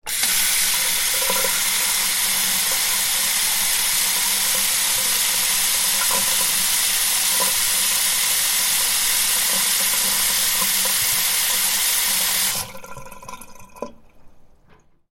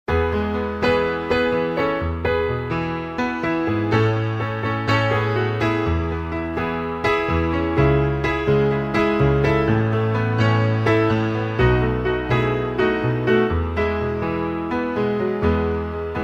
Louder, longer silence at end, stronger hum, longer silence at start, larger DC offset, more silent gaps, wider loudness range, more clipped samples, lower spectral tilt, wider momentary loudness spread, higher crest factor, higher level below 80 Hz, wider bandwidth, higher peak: first, -17 LUFS vs -21 LUFS; first, 0.65 s vs 0 s; neither; about the same, 0.05 s vs 0.1 s; neither; neither; about the same, 3 LU vs 3 LU; neither; second, 1.5 dB/octave vs -8 dB/octave; second, 1 LU vs 6 LU; about the same, 16 dB vs 16 dB; second, -48 dBFS vs -34 dBFS; first, 17 kHz vs 7.8 kHz; about the same, -4 dBFS vs -4 dBFS